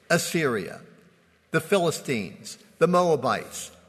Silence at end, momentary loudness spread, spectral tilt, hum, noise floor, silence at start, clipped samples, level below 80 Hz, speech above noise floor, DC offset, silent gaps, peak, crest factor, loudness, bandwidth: 0.2 s; 17 LU; -4.5 dB/octave; none; -59 dBFS; 0.1 s; under 0.1%; -66 dBFS; 35 dB; under 0.1%; none; -6 dBFS; 20 dB; -25 LUFS; 13.5 kHz